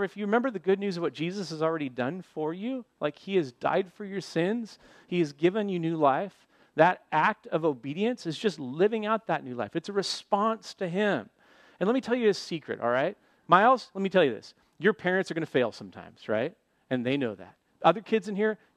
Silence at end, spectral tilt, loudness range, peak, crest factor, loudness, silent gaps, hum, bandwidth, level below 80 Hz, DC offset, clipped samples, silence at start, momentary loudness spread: 0.2 s; -6 dB/octave; 5 LU; -4 dBFS; 24 dB; -28 LUFS; none; none; 11.5 kHz; -78 dBFS; under 0.1%; under 0.1%; 0 s; 10 LU